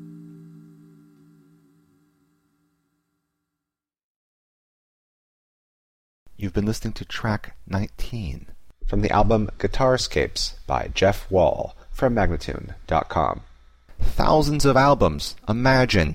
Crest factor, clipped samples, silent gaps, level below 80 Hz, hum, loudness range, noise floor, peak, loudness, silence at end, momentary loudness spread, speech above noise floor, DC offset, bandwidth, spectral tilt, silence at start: 18 dB; under 0.1%; 4.04-6.26 s; -32 dBFS; 60 Hz at -55 dBFS; 10 LU; -87 dBFS; -6 dBFS; -22 LUFS; 0 s; 15 LU; 66 dB; under 0.1%; 16 kHz; -5.5 dB/octave; 0 s